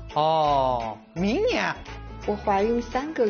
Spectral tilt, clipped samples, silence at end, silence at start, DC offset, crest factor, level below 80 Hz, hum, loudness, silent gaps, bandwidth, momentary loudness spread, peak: -4 dB/octave; under 0.1%; 0 s; 0 s; under 0.1%; 14 dB; -42 dBFS; none; -25 LUFS; none; 7 kHz; 12 LU; -10 dBFS